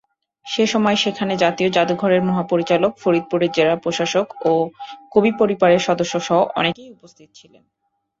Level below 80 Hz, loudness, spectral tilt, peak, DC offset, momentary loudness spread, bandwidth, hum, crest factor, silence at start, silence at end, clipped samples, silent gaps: -60 dBFS; -18 LUFS; -5 dB/octave; -2 dBFS; under 0.1%; 5 LU; 7.8 kHz; none; 16 dB; 0.45 s; 1.3 s; under 0.1%; none